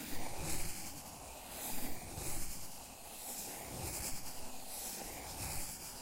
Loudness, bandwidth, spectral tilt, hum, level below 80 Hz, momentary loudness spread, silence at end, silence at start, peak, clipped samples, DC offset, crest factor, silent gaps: -43 LUFS; 16 kHz; -2.5 dB/octave; none; -52 dBFS; 7 LU; 0 s; 0 s; -24 dBFS; under 0.1%; under 0.1%; 16 dB; none